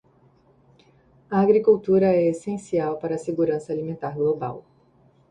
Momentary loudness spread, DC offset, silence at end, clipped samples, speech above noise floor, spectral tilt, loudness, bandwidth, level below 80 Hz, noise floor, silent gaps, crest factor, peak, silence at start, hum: 12 LU; under 0.1%; 0.7 s; under 0.1%; 37 dB; -8.5 dB/octave; -23 LUFS; 10 kHz; -62 dBFS; -58 dBFS; none; 18 dB; -6 dBFS; 1.3 s; none